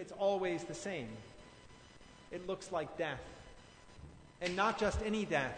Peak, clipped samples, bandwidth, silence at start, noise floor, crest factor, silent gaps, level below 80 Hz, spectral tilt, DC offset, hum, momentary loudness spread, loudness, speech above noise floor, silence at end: -18 dBFS; under 0.1%; 9.6 kHz; 0 s; -58 dBFS; 20 dB; none; -56 dBFS; -4.5 dB/octave; under 0.1%; none; 24 LU; -38 LUFS; 21 dB; 0 s